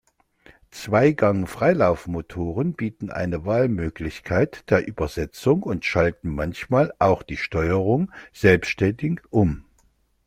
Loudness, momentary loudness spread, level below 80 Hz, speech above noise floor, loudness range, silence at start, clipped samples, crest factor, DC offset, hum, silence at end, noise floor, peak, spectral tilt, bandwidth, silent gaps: -22 LUFS; 10 LU; -44 dBFS; 41 dB; 3 LU; 0.75 s; under 0.1%; 20 dB; under 0.1%; none; 0.65 s; -63 dBFS; -2 dBFS; -7.5 dB/octave; 16 kHz; none